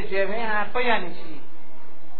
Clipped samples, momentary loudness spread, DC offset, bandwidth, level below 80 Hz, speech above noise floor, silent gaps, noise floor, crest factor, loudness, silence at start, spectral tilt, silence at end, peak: under 0.1%; 20 LU; 10%; 4.7 kHz; -54 dBFS; 24 dB; none; -50 dBFS; 20 dB; -25 LUFS; 0 s; -7.5 dB/octave; 0.05 s; -6 dBFS